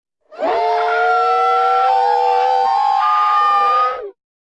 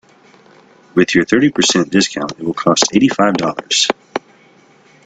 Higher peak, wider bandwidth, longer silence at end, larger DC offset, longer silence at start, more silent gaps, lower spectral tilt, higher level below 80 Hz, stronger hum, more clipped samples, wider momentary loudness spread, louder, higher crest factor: second, -6 dBFS vs 0 dBFS; about the same, 8.6 kHz vs 9.4 kHz; second, 0.4 s vs 0.85 s; first, 0.1% vs under 0.1%; second, 0.3 s vs 0.95 s; neither; second, -1.5 dB/octave vs -3.5 dB/octave; second, -64 dBFS vs -52 dBFS; neither; neither; about the same, 7 LU vs 9 LU; about the same, -15 LUFS vs -14 LUFS; second, 10 dB vs 16 dB